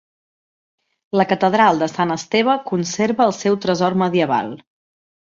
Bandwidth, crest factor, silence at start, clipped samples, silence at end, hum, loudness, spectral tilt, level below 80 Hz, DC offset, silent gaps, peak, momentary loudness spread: 7.8 kHz; 18 dB; 1.15 s; under 0.1%; 0.65 s; none; -18 LUFS; -5 dB/octave; -60 dBFS; under 0.1%; none; -2 dBFS; 7 LU